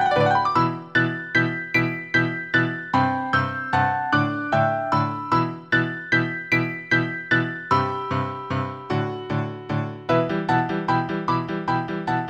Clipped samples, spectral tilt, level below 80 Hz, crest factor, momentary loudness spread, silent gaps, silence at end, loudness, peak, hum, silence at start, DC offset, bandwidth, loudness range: under 0.1%; -7 dB/octave; -56 dBFS; 16 dB; 6 LU; none; 0 s; -23 LUFS; -6 dBFS; none; 0 s; under 0.1%; 15 kHz; 3 LU